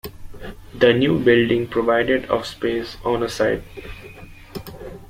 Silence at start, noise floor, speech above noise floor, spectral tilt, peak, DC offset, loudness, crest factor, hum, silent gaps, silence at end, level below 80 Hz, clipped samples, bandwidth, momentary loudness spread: 0.05 s; -40 dBFS; 21 dB; -6 dB/octave; -2 dBFS; under 0.1%; -19 LUFS; 20 dB; none; none; 0.05 s; -42 dBFS; under 0.1%; 16 kHz; 22 LU